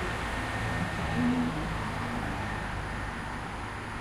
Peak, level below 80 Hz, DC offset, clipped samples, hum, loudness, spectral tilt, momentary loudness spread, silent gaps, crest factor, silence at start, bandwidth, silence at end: -18 dBFS; -42 dBFS; under 0.1%; under 0.1%; none; -33 LUFS; -5.5 dB/octave; 8 LU; none; 14 dB; 0 s; 15.5 kHz; 0 s